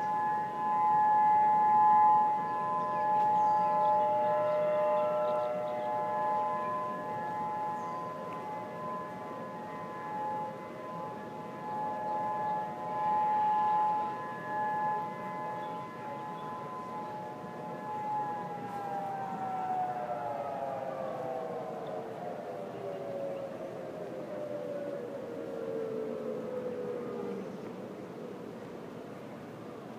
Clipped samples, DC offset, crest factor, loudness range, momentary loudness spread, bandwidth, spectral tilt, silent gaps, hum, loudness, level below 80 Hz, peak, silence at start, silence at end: under 0.1%; under 0.1%; 16 dB; 12 LU; 14 LU; 10.5 kHz; -6.5 dB/octave; none; none; -33 LUFS; -76 dBFS; -16 dBFS; 0 s; 0 s